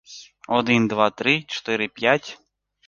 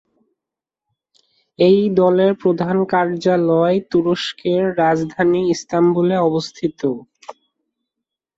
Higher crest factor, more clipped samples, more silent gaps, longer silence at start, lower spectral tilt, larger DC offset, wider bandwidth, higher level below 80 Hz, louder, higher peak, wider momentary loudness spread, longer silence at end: first, 22 dB vs 16 dB; neither; neither; second, 0.1 s vs 1.6 s; second, -5 dB/octave vs -6.5 dB/octave; neither; about the same, 7.4 kHz vs 7.8 kHz; second, -64 dBFS vs -58 dBFS; second, -21 LUFS vs -17 LUFS; about the same, -2 dBFS vs -2 dBFS; first, 18 LU vs 8 LU; second, 0.5 s vs 1.05 s